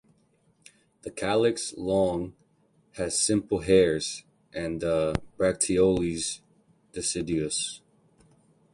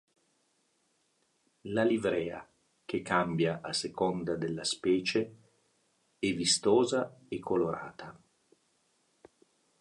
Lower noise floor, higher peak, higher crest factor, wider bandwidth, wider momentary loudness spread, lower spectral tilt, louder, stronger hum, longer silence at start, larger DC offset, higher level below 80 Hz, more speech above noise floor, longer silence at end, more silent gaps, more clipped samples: second, -66 dBFS vs -74 dBFS; first, -8 dBFS vs -12 dBFS; about the same, 20 dB vs 20 dB; about the same, 11.5 kHz vs 11.5 kHz; first, 18 LU vs 15 LU; about the same, -4 dB/octave vs -4 dB/octave; first, -26 LUFS vs -31 LUFS; neither; second, 1.05 s vs 1.65 s; neither; first, -50 dBFS vs -66 dBFS; second, 40 dB vs 44 dB; second, 0.95 s vs 1.65 s; neither; neither